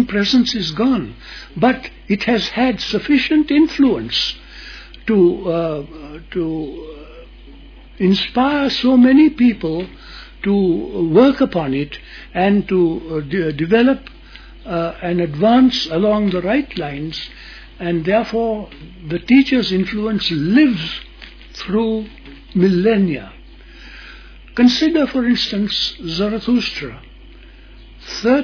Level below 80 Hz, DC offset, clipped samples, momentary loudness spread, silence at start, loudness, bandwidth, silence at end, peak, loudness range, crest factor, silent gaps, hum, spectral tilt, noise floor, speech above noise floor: -40 dBFS; under 0.1%; under 0.1%; 19 LU; 0 s; -16 LUFS; 5.4 kHz; 0 s; 0 dBFS; 5 LU; 16 dB; none; none; -6 dB/octave; -40 dBFS; 24 dB